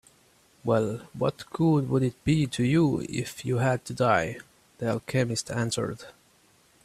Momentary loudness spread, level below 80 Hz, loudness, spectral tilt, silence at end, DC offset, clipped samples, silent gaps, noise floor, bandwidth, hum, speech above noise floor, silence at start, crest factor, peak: 9 LU; -56 dBFS; -27 LUFS; -6 dB/octave; 0.75 s; under 0.1%; under 0.1%; none; -62 dBFS; 14 kHz; none; 36 dB; 0.65 s; 18 dB; -8 dBFS